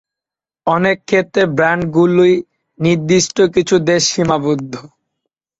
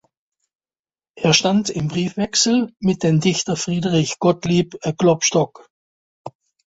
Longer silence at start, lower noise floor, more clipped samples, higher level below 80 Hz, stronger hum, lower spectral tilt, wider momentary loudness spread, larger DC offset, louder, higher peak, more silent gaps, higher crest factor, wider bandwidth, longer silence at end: second, 0.65 s vs 1.15 s; about the same, -88 dBFS vs under -90 dBFS; neither; about the same, -50 dBFS vs -54 dBFS; neither; about the same, -4.5 dB/octave vs -4.5 dB/octave; about the same, 7 LU vs 9 LU; neither; first, -14 LUFS vs -18 LUFS; about the same, -2 dBFS vs -2 dBFS; second, none vs 5.70-6.25 s; about the same, 14 dB vs 18 dB; about the same, 8 kHz vs 8 kHz; first, 0.8 s vs 0.4 s